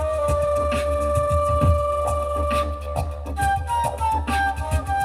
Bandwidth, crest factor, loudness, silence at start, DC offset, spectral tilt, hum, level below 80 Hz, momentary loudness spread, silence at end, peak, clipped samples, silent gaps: 15 kHz; 14 dB; -22 LUFS; 0 s; under 0.1%; -6 dB/octave; none; -28 dBFS; 6 LU; 0 s; -6 dBFS; under 0.1%; none